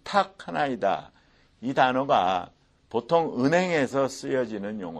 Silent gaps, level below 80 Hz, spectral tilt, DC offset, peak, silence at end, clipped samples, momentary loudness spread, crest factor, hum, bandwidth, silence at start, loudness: none; -64 dBFS; -5.5 dB/octave; under 0.1%; -6 dBFS; 0 s; under 0.1%; 10 LU; 20 dB; none; 12.5 kHz; 0.05 s; -26 LUFS